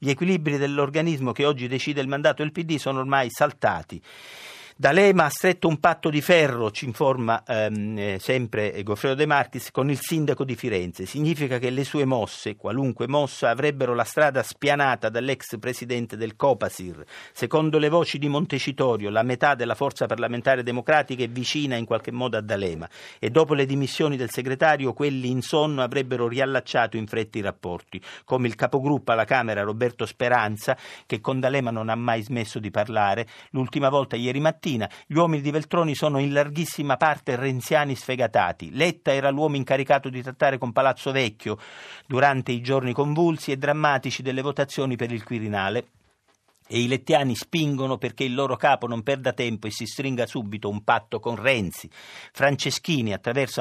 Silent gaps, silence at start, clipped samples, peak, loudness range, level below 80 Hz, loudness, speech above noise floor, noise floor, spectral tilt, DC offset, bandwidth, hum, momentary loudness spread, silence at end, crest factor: none; 0 s; under 0.1%; -4 dBFS; 3 LU; -66 dBFS; -24 LUFS; 42 dB; -65 dBFS; -5.5 dB/octave; under 0.1%; 14.5 kHz; none; 9 LU; 0 s; 20 dB